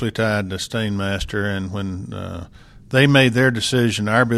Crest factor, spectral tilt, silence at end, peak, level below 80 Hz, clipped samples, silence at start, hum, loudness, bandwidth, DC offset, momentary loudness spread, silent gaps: 18 dB; -5.5 dB/octave; 0 s; -2 dBFS; -42 dBFS; under 0.1%; 0 s; none; -19 LUFS; 14.5 kHz; under 0.1%; 16 LU; none